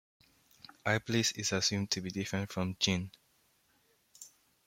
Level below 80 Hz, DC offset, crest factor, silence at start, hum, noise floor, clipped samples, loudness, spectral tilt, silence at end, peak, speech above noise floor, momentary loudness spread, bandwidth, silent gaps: -68 dBFS; under 0.1%; 22 dB; 0.85 s; none; -72 dBFS; under 0.1%; -33 LUFS; -3.5 dB/octave; 0.4 s; -14 dBFS; 38 dB; 23 LU; 16.5 kHz; none